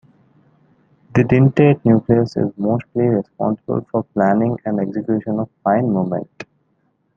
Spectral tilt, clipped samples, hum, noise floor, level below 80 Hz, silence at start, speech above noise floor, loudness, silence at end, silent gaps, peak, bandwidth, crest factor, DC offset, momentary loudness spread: -10 dB/octave; under 0.1%; none; -64 dBFS; -52 dBFS; 1.15 s; 48 dB; -18 LUFS; 0.75 s; none; -2 dBFS; 7.2 kHz; 16 dB; under 0.1%; 10 LU